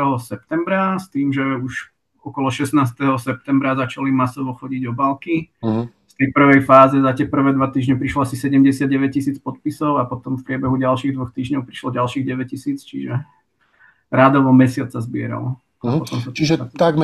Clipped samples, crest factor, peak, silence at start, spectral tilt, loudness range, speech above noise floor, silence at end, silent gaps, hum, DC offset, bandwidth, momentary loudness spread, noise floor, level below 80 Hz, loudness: under 0.1%; 18 dB; 0 dBFS; 0 s; -7 dB/octave; 7 LU; 39 dB; 0 s; none; none; under 0.1%; 12.5 kHz; 13 LU; -56 dBFS; -54 dBFS; -18 LUFS